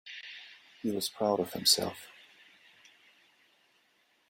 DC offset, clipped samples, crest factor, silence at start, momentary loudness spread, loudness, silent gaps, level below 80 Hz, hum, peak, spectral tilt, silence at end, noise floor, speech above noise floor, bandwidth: under 0.1%; under 0.1%; 26 dB; 0.05 s; 23 LU; -29 LUFS; none; -76 dBFS; none; -10 dBFS; -2.5 dB/octave; 2.2 s; -70 dBFS; 40 dB; 16.5 kHz